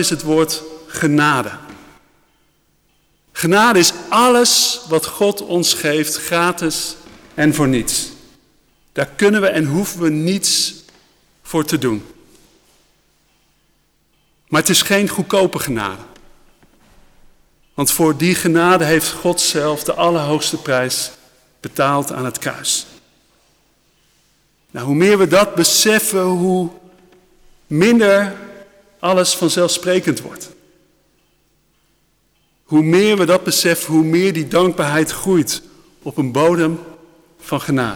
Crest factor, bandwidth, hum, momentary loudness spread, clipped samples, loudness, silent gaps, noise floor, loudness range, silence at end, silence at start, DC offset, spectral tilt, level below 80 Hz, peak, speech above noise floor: 14 dB; over 20 kHz; none; 13 LU; under 0.1%; -15 LUFS; none; -61 dBFS; 7 LU; 0 s; 0 s; under 0.1%; -3.5 dB/octave; -50 dBFS; -4 dBFS; 46 dB